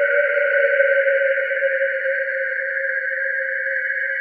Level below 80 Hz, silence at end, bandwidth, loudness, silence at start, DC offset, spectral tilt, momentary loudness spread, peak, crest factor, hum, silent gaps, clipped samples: under -90 dBFS; 0 s; 4.6 kHz; -19 LUFS; 0 s; under 0.1%; 0 dB/octave; 5 LU; -4 dBFS; 16 dB; none; none; under 0.1%